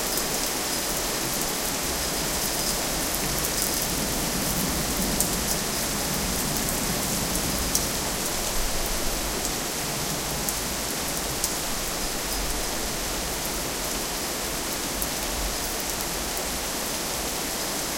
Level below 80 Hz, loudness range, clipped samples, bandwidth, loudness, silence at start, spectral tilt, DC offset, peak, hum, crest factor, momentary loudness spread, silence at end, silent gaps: -38 dBFS; 3 LU; under 0.1%; 17 kHz; -25 LUFS; 0 s; -2 dB/octave; under 0.1%; 0 dBFS; none; 26 dB; 3 LU; 0 s; none